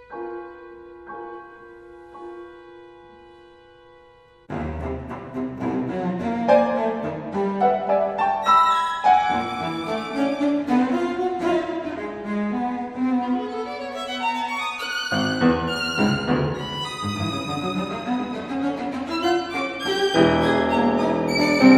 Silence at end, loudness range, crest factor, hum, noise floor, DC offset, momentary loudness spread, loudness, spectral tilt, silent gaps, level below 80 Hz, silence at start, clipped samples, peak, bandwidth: 0 s; 16 LU; 20 dB; none; -52 dBFS; under 0.1%; 16 LU; -23 LUFS; -5.5 dB/octave; none; -50 dBFS; 0 s; under 0.1%; -2 dBFS; 14.5 kHz